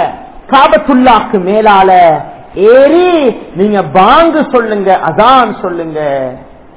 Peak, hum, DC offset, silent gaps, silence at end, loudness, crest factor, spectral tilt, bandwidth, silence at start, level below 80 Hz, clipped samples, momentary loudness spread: 0 dBFS; none; 0.9%; none; 0.35 s; -7 LUFS; 8 dB; -9.5 dB/octave; 4 kHz; 0 s; -38 dBFS; 6%; 11 LU